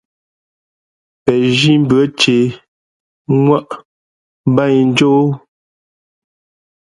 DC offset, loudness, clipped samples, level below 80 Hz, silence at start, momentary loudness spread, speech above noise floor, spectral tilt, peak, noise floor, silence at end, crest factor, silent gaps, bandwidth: under 0.1%; -13 LUFS; under 0.1%; -52 dBFS; 1.25 s; 9 LU; over 78 dB; -6 dB/octave; 0 dBFS; under -90 dBFS; 1.45 s; 16 dB; 2.68-3.25 s, 3.85-4.44 s; 11.5 kHz